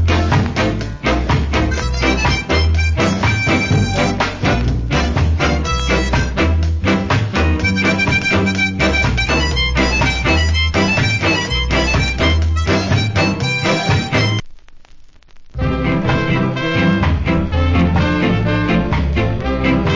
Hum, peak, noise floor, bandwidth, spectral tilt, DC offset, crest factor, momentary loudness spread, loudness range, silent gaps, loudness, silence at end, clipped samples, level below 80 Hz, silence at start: none; -2 dBFS; -39 dBFS; 7.6 kHz; -5.5 dB/octave; under 0.1%; 14 dB; 3 LU; 3 LU; none; -16 LUFS; 0 s; under 0.1%; -22 dBFS; 0 s